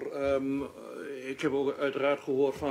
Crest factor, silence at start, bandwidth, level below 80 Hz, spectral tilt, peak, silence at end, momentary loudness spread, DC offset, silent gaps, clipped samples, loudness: 14 dB; 0 s; 14.5 kHz; -64 dBFS; -6 dB/octave; -16 dBFS; 0 s; 11 LU; under 0.1%; none; under 0.1%; -31 LUFS